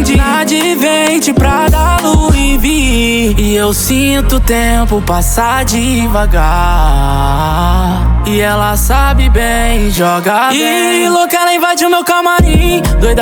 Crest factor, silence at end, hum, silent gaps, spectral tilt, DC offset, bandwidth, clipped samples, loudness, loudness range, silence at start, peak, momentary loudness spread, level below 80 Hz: 8 dB; 0 s; none; none; -4.5 dB/octave; under 0.1%; over 20 kHz; under 0.1%; -10 LUFS; 2 LU; 0 s; 0 dBFS; 2 LU; -14 dBFS